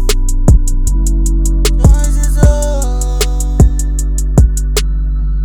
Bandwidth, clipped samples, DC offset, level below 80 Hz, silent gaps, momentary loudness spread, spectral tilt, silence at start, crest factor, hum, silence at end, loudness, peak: 18.5 kHz; 0.5%; under 0.1%; -10 dBFS; none; 6 LU; -5.5 dB/octave; 0 s; 10 dB; none; 0 s; -13 LUFS; 0 dBFS